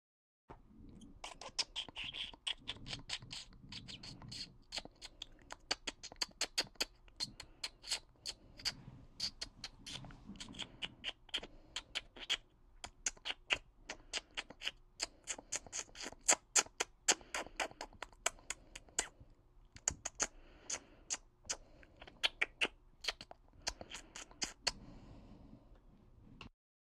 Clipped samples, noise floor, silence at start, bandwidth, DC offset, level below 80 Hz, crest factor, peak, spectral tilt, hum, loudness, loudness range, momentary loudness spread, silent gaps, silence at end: under 0.1%; -64 dBFS; 0.5 s; 15.5 kHz; under 0.1%; -62 dBFS; 32 dB; -14 dBFS; 0 dB/octave; none; -41 LUFS; 9 LU; 19 LU; none; 0.5 s